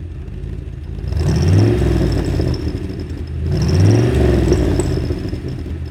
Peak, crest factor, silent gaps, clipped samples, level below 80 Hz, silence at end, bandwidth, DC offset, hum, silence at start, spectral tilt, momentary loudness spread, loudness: -2 dBFS; 14 dB; none; under 0.1%; -24 dBFS; 0 s; 13 kHz; under 0.1%; none; 0 s; -7.5 dB/octave; 15 LU; -17 LUFS